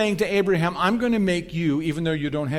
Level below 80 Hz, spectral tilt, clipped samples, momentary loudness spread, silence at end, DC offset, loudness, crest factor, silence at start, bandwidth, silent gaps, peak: -48 dBFS; -6.5 dB/octave; under 0.1%; 4 LU; 0 s; under 0.1%; -23 LUFS; 16 dB; 0 s; 15.5 kHz; none; -6 dBFS